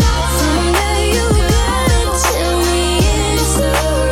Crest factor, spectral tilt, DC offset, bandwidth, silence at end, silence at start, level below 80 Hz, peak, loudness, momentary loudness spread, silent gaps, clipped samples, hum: 12 dB; -4 dB/octave; under 0.1%; 16.5 kHz; 0 s; 0 s; -18 dBFS; -2 dBFS; -14 LUFS; 1 LU; none; under 0.1%; none